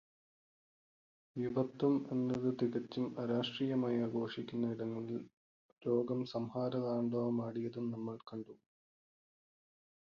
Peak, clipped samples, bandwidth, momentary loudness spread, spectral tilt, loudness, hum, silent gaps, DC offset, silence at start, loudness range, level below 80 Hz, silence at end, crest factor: -22 dBFS; under 0.1%; 7 kHz; 10 LU; -6.5 dB/octave; -38 LUFS; none; 5.33-5.76 s; under 0.1%; 1.35 s; 4 LU; -78 dBFS; 1.55 s; 18 dB